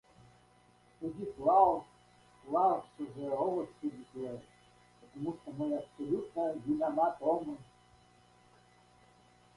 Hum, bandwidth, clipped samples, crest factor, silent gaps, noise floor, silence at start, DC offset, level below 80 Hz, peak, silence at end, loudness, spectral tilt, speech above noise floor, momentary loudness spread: 60 Hz at -60 dBFS; 11.5 kHz; under 0.1%; 24 dB; none; -65 dBFS; 1 s; under 0.1%; -70 dBFS; -12 dBFS; 1.95 s; -34 LUFS; -8 dB/octave; 32 dB; 15 LU